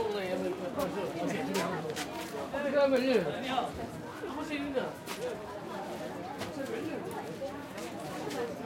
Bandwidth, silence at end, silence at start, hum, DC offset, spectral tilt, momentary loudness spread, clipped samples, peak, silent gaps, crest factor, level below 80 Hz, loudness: 16.5 kHz; 0 s; 0 s; none; under 0.1%; -5 dB/octave; 11 LU; under 0.1%; -14 dBFS; none; 20 dB; -64 dBFS; -35 LUFS